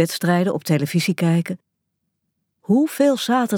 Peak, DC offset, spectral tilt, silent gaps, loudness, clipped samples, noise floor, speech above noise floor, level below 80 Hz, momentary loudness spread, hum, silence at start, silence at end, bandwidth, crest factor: -4 dBFS; under 0.1%; -6 dB/octave; none; -19 LUFS; under 0.1%; -76 dBFS; 57 dB; -72 dBFS; 10 LU; none; 0 s; 0 s; 18.5 kHz; 16 dB